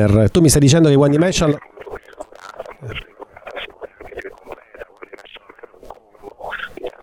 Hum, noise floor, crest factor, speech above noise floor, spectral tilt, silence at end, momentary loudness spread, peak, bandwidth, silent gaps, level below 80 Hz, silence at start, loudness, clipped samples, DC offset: none; -42 dBFS; 16 dB; 29 dB; -5.5 dB/octave; 0.15 s; 26 LU; -2 dBFS; 15 kHz; none; -38 dBFS; 0 s; -14 LUFS; under 0.1%; under 0.1%